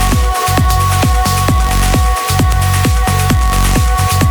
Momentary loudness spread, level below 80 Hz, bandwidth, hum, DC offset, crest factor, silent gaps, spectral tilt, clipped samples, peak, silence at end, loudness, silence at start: 1 LU; -14 dBFS; over 20 kHz; none; under 0.1%; 10 dB; none; -4.5 dB/octave; under 0.1%; 0 dBFS; 0 s; -12 LUFS; 0 s